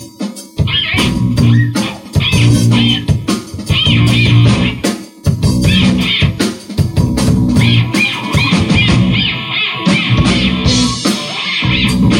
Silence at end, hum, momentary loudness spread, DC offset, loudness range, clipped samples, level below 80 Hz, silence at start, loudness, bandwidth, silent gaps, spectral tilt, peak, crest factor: 0 s; none; 8 LU; under 0.1%; 1 LU; under 0.1%; -26 dBFS; 0 s; -12 LUFS; 15.5 kHz; none; -5 dB/octave; 0 dBFS; 12 dB